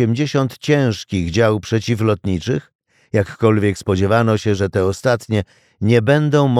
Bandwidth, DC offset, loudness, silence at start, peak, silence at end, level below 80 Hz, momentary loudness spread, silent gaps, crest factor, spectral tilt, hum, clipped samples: 14 kHz; under 0.1%; -17 LUFS; 0 s; -2 dBFS; 0 s; -46 dBFS; 7 LU; 2.75-2.79 s; 14 dB; -6.5 dB/octave; none; under 0.1%